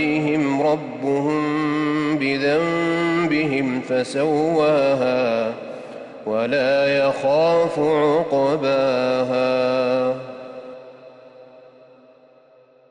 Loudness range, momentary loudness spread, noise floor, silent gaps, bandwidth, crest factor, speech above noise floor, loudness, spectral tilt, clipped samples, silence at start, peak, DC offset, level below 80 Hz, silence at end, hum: 5 LU; 13 LU; -52 dBFS; none; 10 kHz; 12 dB; 33 dB; -20 LUFS; -6 dB/octave; under 0.1%; 0 s; -10 dBFS; under 0.1%; -62 dBFS; 1.45 s; none